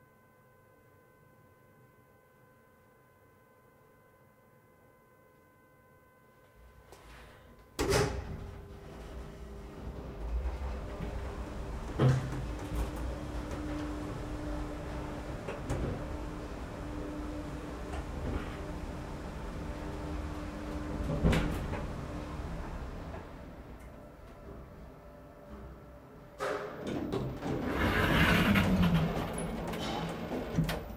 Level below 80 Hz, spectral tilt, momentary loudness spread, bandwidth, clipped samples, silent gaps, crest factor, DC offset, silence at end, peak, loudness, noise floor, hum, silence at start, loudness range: -44 dBFS; -6 dB/octave; 21 LU; 16 kHz; under 0.1%; none; 24 dB; under 0.1%; 0 s; -14 dBFS; -35 LUFS; -62 dBFS; none; 1.8 s; 14 LU